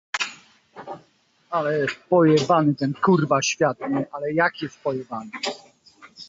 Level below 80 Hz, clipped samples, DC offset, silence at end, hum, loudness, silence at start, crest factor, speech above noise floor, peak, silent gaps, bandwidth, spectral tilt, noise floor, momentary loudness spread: -66 dBFS; under 0.1%; under 0.1%; 0.05 s; none; -22 LUFS; 0.15 s; 18 dB; 40 dB; -6 dBFS; none; 8 kHz; -5 dB/octave; -61 dBFS; 21 LU